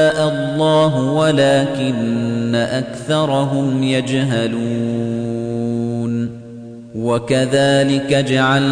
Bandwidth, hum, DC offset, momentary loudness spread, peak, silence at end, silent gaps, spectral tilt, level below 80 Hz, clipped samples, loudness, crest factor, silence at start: 10 kHz; none; under 0.1%; 8 LU; -4 dBFS; 0 s; none; -6 dB/octave; -52 dBFS; under 0.1%; -17 LUFS; 12 dB; 0 s